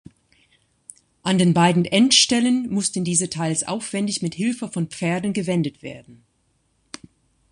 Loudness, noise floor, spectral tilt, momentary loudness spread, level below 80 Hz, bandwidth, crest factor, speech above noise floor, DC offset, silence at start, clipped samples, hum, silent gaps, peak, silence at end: -20 LUFS; -67 dBFS; -4 dB/octave; 21 LU; -60 dBFS; 11 kHz; 20 dB; 46 dB; under 0.1%; 1.25 s; under 0.1%; none; none; -2 dBFS; 1.4 s